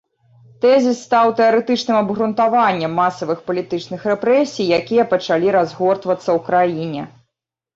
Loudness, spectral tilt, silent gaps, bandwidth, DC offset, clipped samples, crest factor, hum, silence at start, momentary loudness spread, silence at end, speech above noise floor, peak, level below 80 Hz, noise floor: -17 LUFS; -5.5 dB/octave; none; 8 kHz; under 0.1%; under 0.1%; 14 dB; none; 0.65 s; 8 LU; 0.7 s; 63 dB; -4 dBFS; -60 dBFS; -79 dBFS